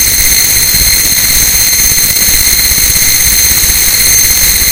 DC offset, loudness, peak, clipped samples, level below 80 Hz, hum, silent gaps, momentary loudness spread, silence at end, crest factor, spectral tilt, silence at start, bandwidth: under 0.1%; -4 LUFS; 0 dBFS; 3%; -22 dBFS; none; none; 1 LU; 0 s; 8 dB; 0.5 dB/octave; 0 s; over 20 kHz